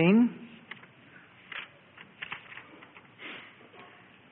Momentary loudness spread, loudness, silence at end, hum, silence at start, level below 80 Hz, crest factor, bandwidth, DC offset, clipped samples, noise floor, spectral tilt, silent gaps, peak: 24 LU; -32 LUFS; 0.9 s; none; 0 s; -76 dBFS; 22 dB; 4.2 kHz; under 0.1%; under 0.1%; -55 dBFS; -10.5 dB/octave; none; -12 dBFS